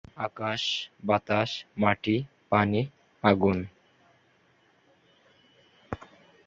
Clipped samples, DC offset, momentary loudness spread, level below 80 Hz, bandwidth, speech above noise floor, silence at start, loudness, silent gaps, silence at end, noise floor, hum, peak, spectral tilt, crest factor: under 0.1%; under 0.1%; 16 LU; -56 dBFS; 7.6 kHz; 38 dB; 0.15 s; -27 LUFS; none; 0.4 s; -65 dBFS; none; -8 dBFS; -6 dB/octave; 22 dB